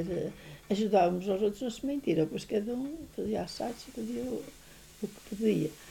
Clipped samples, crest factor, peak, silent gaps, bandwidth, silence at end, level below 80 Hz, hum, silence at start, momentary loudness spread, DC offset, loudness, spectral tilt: under 0.1%; 18 dB; -14 dBFS; none; 19 kHz; 0 s; -58 dBFS; none; 0 s; 14 LU; under 0.1%; -33 LUFS; -6.5 dB/octave